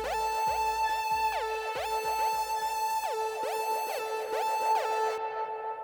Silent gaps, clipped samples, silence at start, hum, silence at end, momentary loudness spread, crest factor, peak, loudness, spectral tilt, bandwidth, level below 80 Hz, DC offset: none; under 0.1%; 0 s; none; 0 s; 5 LU; 14 dB; -18 dBFS; -30 LUFS; -1 dB/octave; over 20 kHz; -58 dBFS; under 0.1%